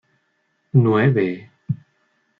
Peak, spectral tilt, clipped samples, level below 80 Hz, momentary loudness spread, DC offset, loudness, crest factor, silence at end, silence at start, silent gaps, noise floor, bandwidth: -4 dBFS; -10.5 dB/octave; under 0.1%; -62 dBFS; 14 LU; under 0.1%; -20 LUFS; 18 dB; 0.65 s; 0.75 s; none; -68 dBFS; 4.5 kHz